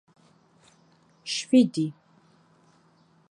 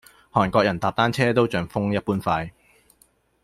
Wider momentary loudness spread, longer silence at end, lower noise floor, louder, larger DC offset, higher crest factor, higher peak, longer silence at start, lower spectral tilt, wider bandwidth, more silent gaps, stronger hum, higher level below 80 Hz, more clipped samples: first, 13 LU vs 6 LU; first, 1.4 s vs 0.95 s; about the same, -62 dBFS vs -61 dBFS; about the same, -24 LUFS vs -22 LUFS; neither; about the same, 20 dB vs 20 dB; second, -8 dBFS vs -4 dBFS; first, 1.25 s vs 0.35 s; second, -5 dB/octave vs -6.5 dB/octave; second, 10.5 kHz vs 15 kHz; neither; neither; second, -78 dBFS vs -52 dBFS; neither